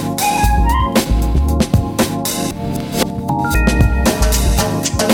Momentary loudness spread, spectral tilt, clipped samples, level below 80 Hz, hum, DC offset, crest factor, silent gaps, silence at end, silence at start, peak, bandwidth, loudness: 5 LU; -5 dB/octave; under 0.1%; -18 dBFS; none; under 0.1%; 14 dB; none; 0 s; 0 s; 0 dBFS; 18.5 kHz; -16 LUFS